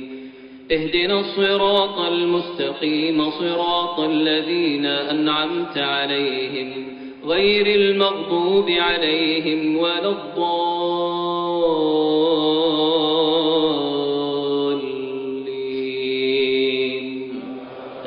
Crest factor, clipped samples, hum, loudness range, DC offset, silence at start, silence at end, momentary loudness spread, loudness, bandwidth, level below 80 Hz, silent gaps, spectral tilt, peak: 14 dB; under 0.1%; none; 3 LU; under 0.1%; 0 s; 0 s; 10 LU; -20 LUFS; 5.4 kHz; -56 dBFS; none; -2 dB/octave; -6 dBFS